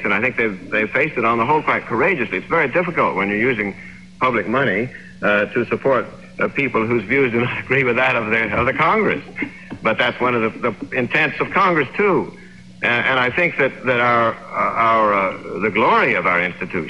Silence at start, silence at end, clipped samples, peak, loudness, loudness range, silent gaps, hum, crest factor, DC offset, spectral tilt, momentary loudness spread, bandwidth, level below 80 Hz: 0 s; 0 s; under 0.1%; -4 dBFS; -18 LUFS; 2 LU; none; none; 14 dB; 0.3%; -7 dB/octave; 7 LU; 10.5 kHz; -50 dBFS